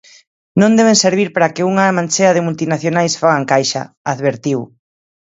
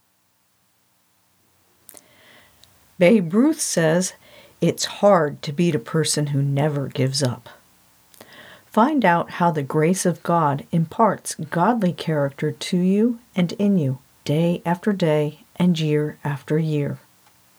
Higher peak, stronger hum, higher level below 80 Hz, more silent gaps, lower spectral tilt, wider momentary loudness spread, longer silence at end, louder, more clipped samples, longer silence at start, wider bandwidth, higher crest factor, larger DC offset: first, 0 dBFS vs -4 dBFS; neither; first, -60 dBFS vs -68 dBFS; first, 3.97-4.05 s vs none; about the same, -4.5 dB/octave vs -5.5 dB/octave; about the same, 10 LU vs 8 LU; first, 0.75 s vs 0.6 s; first, -14 LUFS vs -21 LUFS; neither; second, 0.55 s vs 3 s; second, 8 kHz vs over 20 kHz; about the same, 14 dB vs 18 dB; neither